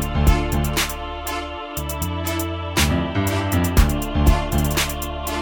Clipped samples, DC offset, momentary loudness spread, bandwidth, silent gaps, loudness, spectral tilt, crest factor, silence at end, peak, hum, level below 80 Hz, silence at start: under 0.1%; under 0.1%; 8 LU; over 20 kHz; none; -21 LUFS; -4.5 dB/octave; 18 dB; 0 s; -2 dBFS; none; -24 dBFS; 0 s